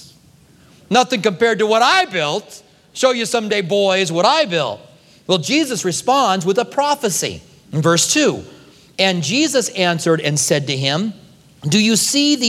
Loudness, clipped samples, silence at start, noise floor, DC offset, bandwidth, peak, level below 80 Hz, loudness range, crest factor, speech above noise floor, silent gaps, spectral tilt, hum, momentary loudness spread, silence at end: -16 LUFS; under 0.1%; 0 s; -49 dBFS; under 0.1%; 16.5 kHz; 0 dBFS; -60 dBFS; 2 LU; 18 dB; 33 dB; none; -3.5 dB/octave; none; 11 LU; 0 s